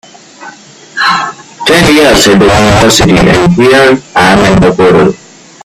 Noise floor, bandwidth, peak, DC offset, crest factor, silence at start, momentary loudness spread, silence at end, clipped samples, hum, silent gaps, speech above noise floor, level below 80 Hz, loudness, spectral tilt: -31 dBFS; 16.5 kHz; 0 dBFS; under 0.1%; 6 dB; 0.4 s; 8 LU; 0.5 s; 0.7%; none; none; 27 dB; -26 dBFS; -5 LUFS; -4.5 dB/octave